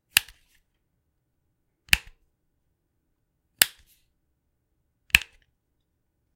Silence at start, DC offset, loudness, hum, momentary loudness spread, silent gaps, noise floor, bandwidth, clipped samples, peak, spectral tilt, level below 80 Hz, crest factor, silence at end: 0.15 s; under 0.1%; -23 LUFS; none; 2 LU; none; -75 dBFS; 16 kHz; under 0.1%; 0 dBFS; 0.5 dB/octave; -50 dBFS; 32 dB; 1.15 s